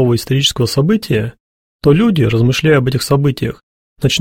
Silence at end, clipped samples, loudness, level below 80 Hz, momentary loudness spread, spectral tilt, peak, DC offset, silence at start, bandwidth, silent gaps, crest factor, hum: 0 s; under 0.1%; -14 LUFS; -40 dBFS; 8 LU; -5.5 dB/octave; 0 dBFS; under 0.1%; 0 s; 16.5 kHz; 1.40-1.79 s, 3.63-3.96 s; 14 dB; none